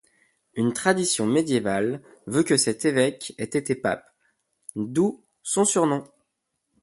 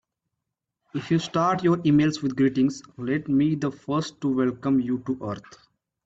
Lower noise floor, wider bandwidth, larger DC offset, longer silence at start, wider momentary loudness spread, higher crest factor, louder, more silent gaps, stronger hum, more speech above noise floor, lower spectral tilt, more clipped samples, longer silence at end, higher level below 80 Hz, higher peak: second, -78 dBFS vs -83 dBFS; first, 12 kHz vs 8 kHz; neither; second, 0.55 s vs 0.95 s; about the same, 13 LU vs 11 LU; first, 20 dB vs 14 dB; about the same, -24 LUFS vs -24 LUFS; neither; neither; second, 55 dB vs 59 dB; second, -4 dB/octave vs -7 dB/octave; neither; first, 0.8 s vs 0.65 s; about the same, -64 dBFS vs -60 dBFS; first, -4 dBFS vs -10 dBFS